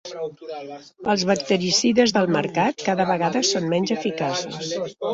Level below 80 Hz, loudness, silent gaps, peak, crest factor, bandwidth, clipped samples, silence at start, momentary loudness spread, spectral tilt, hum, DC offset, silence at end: -62 dBFS; -21 LUFS; none; -4 dBFS; 18 dB; 8 kHz; under 0.1%; 0.05 s; 14 LU; -4 dB/octave; none; under 0.1%; 0 s